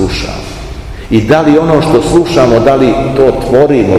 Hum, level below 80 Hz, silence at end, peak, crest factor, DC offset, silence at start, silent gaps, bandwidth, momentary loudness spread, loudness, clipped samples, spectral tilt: none; -26 dBFS; 0 s; 0 dBFS; 8 dB; 0.7%; 0 s; none; 14 kHz; 16 LU; -8 LUFS; 4%; -6.5 dB/octave